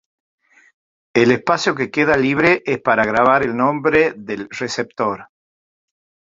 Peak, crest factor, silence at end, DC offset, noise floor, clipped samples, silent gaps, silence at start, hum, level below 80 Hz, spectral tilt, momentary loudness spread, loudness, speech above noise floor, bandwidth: -2 dBFS; 18 dB; 1.05 s; under 0.1%; under -90 dBFS; under 0.1%; none; 1.15 s; none; -52 dBFS; -5.5 dB/octave; 10 LU; -17 LUFS; over 73 dB; 7.8 kHz